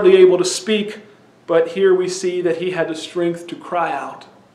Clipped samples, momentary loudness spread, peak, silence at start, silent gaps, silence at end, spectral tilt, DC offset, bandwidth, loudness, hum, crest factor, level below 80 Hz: under 0.1%; 15 LU; 0 dBFS; 0 s; none; 0.35 s; -4.5 dB/octave; under 0.1%; 12 kHz; -18 LUFS; none; 16 dB; -68 dBFS